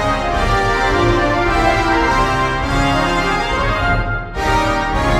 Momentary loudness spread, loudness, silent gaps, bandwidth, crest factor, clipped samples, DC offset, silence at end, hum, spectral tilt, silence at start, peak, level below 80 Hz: 3 LU; -16 LUFS; none; 15 kHz; 14 dB; under 0.1%; under 0.1%; 0 s; none; -5 dB/octave; 0 s; -2 dBFS; -24 dBFS